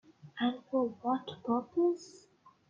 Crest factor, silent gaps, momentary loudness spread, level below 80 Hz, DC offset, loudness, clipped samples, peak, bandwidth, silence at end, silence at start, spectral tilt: 14 dB; none; 10 LU; -78 dBFS; under 0.1%; -34 LUFS; under 0.1%; -20 dBFS; 7.6 kHz; 0.55 s; 0.25 s; -6 dB/octave